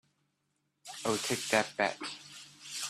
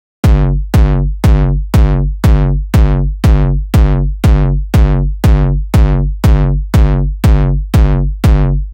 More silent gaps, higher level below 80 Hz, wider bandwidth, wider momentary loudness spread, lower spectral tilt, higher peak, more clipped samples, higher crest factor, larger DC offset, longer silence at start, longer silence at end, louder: neither; second, -74 dBFS vs -12 dBFS; about the same, 15.5 kHz vs 16.5 kHz; first, 18 LU vs 2 LU; second, -2.5 dB/octave vs -8 dB/octave; second, -10 dBFS vs 0 dBFS; neither; first, 26 dB vs 8 dB; neither; first, 0.85 s vs 0.25 s; about the same, 0 s vs 0 s; second, -33 LUFS vs -12 LUFS